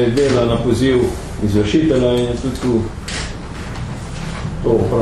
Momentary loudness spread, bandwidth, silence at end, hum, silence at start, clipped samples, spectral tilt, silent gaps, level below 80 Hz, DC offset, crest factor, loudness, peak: 12 LU; 13 kHz; 0 s; none; 0 s; under 0.1%; -6.5 dB/octave; none; -30 dBFS; under 0.1%; 14 dB; -18 LUFS; -2 dBFS